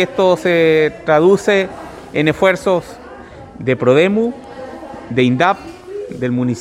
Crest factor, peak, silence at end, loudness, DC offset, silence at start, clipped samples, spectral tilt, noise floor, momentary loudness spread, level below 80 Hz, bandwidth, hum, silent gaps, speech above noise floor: 16 dB; 0 dBFS; 0 s; -15 LUFS; under 0.1%; 0 s; under 0.1%; -6 dB/octave; -35 dBFS; 20 LU; -48 dBFS; 14 kHz; none; none; 21 dB